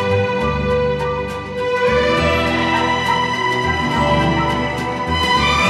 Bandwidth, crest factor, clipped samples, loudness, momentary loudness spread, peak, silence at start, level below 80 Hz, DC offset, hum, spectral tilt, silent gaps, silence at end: 14 kHz; 12 dB; under 0.1%; -17 LUFS; 6 LU; -4 dBFS; 0 s; -32 dBFS; under 0.1%; none; -5 dB/octave; none; 0 s